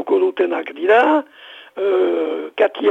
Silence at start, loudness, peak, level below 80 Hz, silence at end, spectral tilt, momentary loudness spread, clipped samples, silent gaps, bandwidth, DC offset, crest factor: 0 s; -17 LUFS; -4 dBFS; -74 dBFS; 0 s; -5 dB/octave; 10 LU; under 0.1%; none; 5.4 kHz; under 0.1%; 14 dB